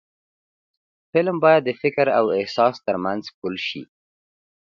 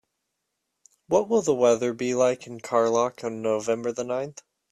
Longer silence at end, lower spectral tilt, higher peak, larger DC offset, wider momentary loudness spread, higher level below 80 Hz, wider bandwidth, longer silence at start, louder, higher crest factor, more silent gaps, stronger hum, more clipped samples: first, 0.85 s vs 0.4 s; first, -6.5 dB/octave vs -5 dB/octave; first, -2 dBFS vs -8 dBFS; neither; first, 12 LU vs 9 LU; about the same, -66 dBFS vs -66 dBFS; second, 7.2 kHz vs 12.5 kHz; about the same, 1.15 s vs 1.1 s; first, -21 LUFS vs -25 LUFS; about the same, 20 dB vs 18 dB; first, 3.34-3.42 s vs none; neither; neither